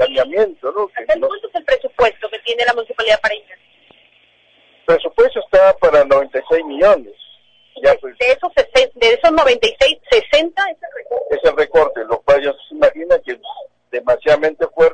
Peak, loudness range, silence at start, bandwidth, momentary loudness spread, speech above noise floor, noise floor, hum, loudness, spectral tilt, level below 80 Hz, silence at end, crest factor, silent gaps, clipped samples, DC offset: -2 dBFS; 4 LU; 0 s; 9.2 kHz; 11 LU; 39 dB; -53 dBFS; 60 Hz at -65 dBFS; -15 LUFS; -3 dB/octave; -44 dBFS; 0 s; 14 dB; none; under 0.1%; under 0.1%